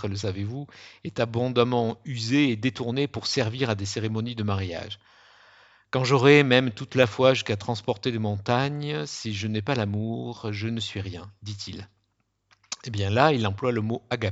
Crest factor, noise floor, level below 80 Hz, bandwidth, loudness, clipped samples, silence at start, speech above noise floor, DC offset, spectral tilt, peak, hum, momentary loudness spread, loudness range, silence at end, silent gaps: 24 dB; -74 dBFS; -62 dBFS; 8 kHz; -25 LUFS; under 0.1%; 0 s; 48 dB; under 0.1%; -5.5 dB/octave; -2 dBFS; none; 16 LU; 8 LU; 0 s; none